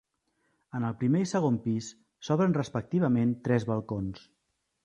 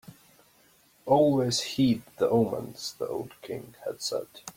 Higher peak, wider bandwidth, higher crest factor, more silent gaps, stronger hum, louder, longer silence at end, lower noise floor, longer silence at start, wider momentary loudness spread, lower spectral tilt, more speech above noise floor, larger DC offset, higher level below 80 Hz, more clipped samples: about the same, -12 dBFS vs -10 dBFS; second, 9 kHz vs 16.5 kHz; about the same, 18 dB vs 18 dB; neither; neither; about the same, -29 LUFS vs -28 LUFS; first, 0.65 s vs 0.05 s; first, -75 dBFS vs -62 dBFS; first, 0.75 s vs 0.1 s; second, 13 LU vs 16 LU; first, -7.5 dB/octave vs -5.5 dB/octave; first, 47 dB vs 34 dB; neither; about the same, -60 dBFS vs -64 dBFS; neither